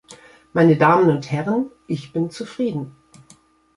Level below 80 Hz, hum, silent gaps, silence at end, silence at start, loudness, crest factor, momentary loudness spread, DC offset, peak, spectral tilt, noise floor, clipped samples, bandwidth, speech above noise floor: -60 dBFS; none; none; 0.85 s; 0.1 s; -19 LUFS; 18 dB; 14 LU; under 0.1%; -2 dBFS; -7.5 dB/octave; -53 dBFS; under 0.1%; 11.5 kHz; 35 dB